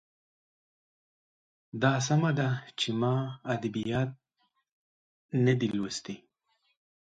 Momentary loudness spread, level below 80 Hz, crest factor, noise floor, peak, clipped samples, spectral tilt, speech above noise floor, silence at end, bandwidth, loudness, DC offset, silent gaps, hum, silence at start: 10 LU; -68 dBFS; 22 dB; -76 dBFS; -10 dBFS; under 0.1%; -5.5 dB/octave; 48 dB; 0.85 s; 9.2 kHz; -30 LUFS; under 0.1%; 4.72-5.29 s; none; 1.75 s